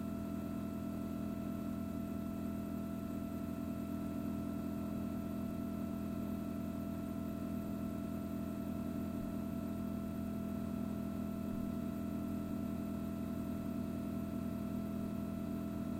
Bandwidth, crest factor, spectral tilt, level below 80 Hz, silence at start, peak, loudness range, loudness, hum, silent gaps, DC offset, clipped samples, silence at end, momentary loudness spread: 16.5 kHz; 12 dB; -8 dB/octave; -58 dBFS; 0 s; -30 dBFS; 1 LU; -41 LUFS; none; none; under 0.1%; under 0.1%; 0 s; 1 LU